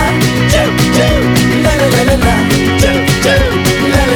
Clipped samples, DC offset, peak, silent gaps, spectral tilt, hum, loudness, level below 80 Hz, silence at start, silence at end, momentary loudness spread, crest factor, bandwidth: under 0.1%; under 0.1%; 0 dBFS; none; -5 dB/octave; none; -10 LUFS; -20 dBFS; 0 s; 0 s; 1 LU; 10 dB; over 20 kHz